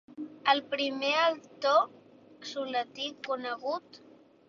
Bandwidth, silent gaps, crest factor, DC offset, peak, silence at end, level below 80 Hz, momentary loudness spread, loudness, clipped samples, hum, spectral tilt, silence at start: 7.4 kHz; none; 22 dB; under 0.1%; -10 dBFS; 0.5 s; -80 dBFS; 12 LU; -30 LUFS; under 0.1%; none; -2.5 dB/octave; 0.1 s